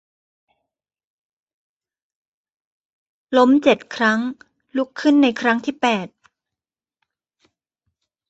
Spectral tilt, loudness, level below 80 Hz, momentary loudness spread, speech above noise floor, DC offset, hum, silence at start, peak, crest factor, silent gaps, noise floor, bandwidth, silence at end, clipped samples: -5 dB/octave; -18 LUFS; -66 dBFS; 11 LU; 72 dB; under 0.1%; none; 3.3 s; -2 dBFS; 20 dB; none; -89 dBFS; 8.2 kHz; 2.25 s; under 0.1%